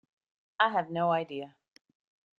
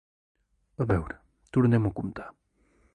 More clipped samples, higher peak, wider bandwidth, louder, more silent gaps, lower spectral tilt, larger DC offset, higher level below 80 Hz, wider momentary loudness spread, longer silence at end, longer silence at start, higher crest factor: neither; about the same, -10 dBFS vs -10 dBFS; second, 6.8 kHz vs 9.4 kHz; about the same, -29 LUFS vs -27 LUFS; neither; second, -7 dB/octave vs -10 dB/octave; neither; second, -82 dBFS vs -48 dBFS; second, 19 LU vs 22 LU; first, 0.9 s vs 0.65 s; second, 0.6 s vs 0.8 s; about the same, 22 dB vs 18 dB